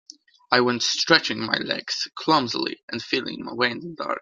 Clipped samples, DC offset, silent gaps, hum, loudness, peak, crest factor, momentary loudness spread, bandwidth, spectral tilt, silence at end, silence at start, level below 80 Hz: under 0.1%; under 0.1%; 2.83-2.88 s; none; -23 LUFS; 0 dBFS; 24 dB; 11 LU; 9.2 kHz; -3 dB/octave; 0 s; 0.5 s; -68 dBFS